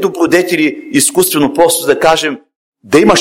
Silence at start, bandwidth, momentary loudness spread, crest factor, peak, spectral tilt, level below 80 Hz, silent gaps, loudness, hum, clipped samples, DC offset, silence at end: 0 s; 17 kHz; 4 LU; 12 dB; 0 dBFS; -3 dB/octave; -44 dBFS; 2.56-2.72 s; -11 LUFS; none; 0.2%; under 0.1%; 0 s